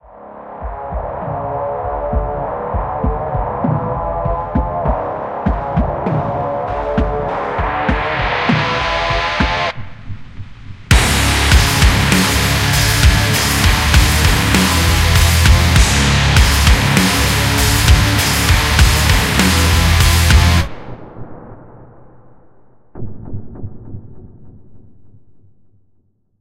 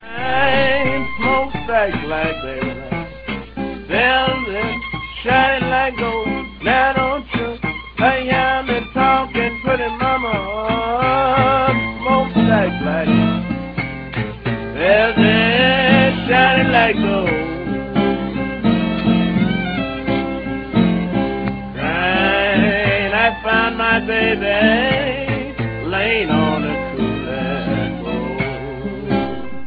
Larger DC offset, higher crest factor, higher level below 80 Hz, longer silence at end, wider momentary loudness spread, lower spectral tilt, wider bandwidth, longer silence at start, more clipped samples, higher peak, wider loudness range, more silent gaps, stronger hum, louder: neither; about the same, 14 dB vs 16 dB; first, -20 dBFS vs -36 dBFS; first, 1 s vs 0 s; first, 20 LU vs 10 LU; second, -4 dB/octave vs -9 dB/octave; first, 16.5 kHz vs 5.2 kHz; first, 0.15 s vs 0 s; neither; about the same, 0 dBFS vs 0 dBFS; first, 8 LU vs 5 LU; neither; neither; first, -14 LUFS vs -17 LUFS